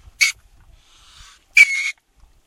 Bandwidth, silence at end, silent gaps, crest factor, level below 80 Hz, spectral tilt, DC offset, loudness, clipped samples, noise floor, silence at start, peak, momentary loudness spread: 16 kHz; 0.55 s; none; 22 dB; -52 dBFS; 3.5 dB/octave; under 0.1%; -15 LUFS; under 0.1%; -54 dBFS; 0.2 s; 0 dBFS; 11 LU